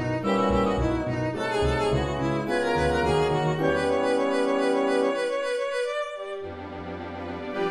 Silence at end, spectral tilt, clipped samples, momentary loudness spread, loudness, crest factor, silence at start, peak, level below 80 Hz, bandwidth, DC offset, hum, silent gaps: 0 s; -6 dB/octave; under 0.1%; 11 LU; -25 LUFS; 14 dB; 0 s; -10 dBFS; -40 dBFS; 12.5 kHz; under 0.1%; none; none